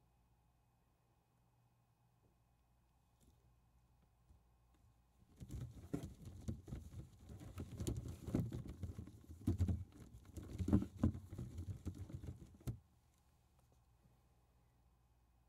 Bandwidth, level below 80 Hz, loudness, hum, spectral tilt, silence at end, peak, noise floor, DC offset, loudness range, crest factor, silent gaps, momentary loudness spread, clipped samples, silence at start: 15.5 kHz; -60 dBFS; -46 LUFS; none; -8 dB/octave; 2.7 s; -20 dBFS; -77 dBFS; under 0.1%; 13 LU; 28 dB; none; 17 LU; under 0.1%; 3.25 s